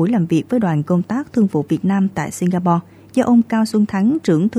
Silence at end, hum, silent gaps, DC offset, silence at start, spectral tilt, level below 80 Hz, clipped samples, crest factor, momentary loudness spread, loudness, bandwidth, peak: 0 s; none; none; under 0.1%; 0 s; -7.5 dB/octave; -56 dBFS; under 0.1%; 14 dB; 6 LU; -17 LUFS; 13 kHz; -2 dBFS